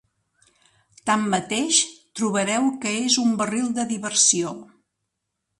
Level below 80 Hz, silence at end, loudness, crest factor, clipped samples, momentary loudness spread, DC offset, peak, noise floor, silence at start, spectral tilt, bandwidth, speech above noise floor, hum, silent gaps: -68 dBFS; 0.95 s; -21 LUFS; 20 dB; under 0.1%; 10 LU; under 0.1%; -4 dBFS; -79 dBFS; 1.05 s; -2 dB/octave; 11.5 kHz; 57 dB; none; none